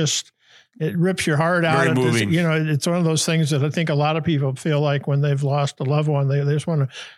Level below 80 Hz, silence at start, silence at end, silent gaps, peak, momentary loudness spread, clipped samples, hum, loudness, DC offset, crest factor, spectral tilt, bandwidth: -62 dBFS; 0 s; 0.05 s; none; -6 dBFS; 4 LU; under 0.1%; none; -20 LUFS; under 0.1%; 14 dB; -5.5 dB/octave; 12.5 kHz